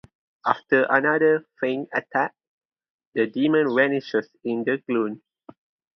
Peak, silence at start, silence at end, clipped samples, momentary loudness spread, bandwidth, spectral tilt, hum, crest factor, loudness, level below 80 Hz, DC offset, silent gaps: 0 dBFS; 0.45 s; 0.8 s; under 0.1%; 10 LU; 6.2 kHz; -7.5 dB/octave; none; 24 dB; -23 LUFS; -72 dBFS; under 0.1%; 2.47-2.69 s, 2.90-2.99 s, 3.07-3.12 s